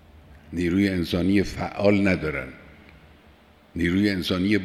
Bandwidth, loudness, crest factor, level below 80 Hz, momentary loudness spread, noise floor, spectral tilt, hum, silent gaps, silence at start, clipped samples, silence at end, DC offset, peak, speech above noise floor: 14.5 kHz; -23 LUFS; 18 dB; -48 dBFS; 11 LU; -53 dBFS; -6.5 dB/octave; none; none; 0.3 s; under 0.1%; 0 s; under 0.1%; -6 dBFS; 31 dB